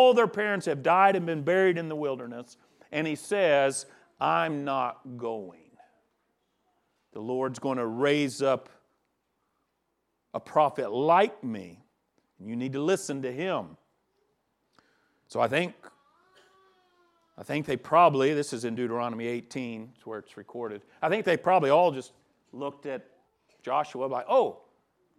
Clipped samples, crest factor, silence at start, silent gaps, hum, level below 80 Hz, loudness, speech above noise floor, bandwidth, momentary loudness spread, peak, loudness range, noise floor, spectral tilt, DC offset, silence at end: under 0.1%; 22 dB; 0 s; none; none; -76 dBFS; -27 LUFS; 51 dB; 13.5 kHz; 18 LU; -8 dBFS; 6 LU; -78 dBFS; -5 dB/octave; under 0.1%; 0.65 s